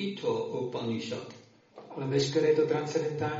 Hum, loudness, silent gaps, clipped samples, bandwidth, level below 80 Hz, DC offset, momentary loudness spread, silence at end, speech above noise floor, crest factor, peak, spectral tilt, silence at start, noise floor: none; -30 LUFS; none; under 0.1%; 7.6 kHz; -70 dBFS; under 0.1%; 13 LU; 0 s; 21 dB; 16 dB; -14 dBFS; -5 dB/octave; 0 s; -51 dBFS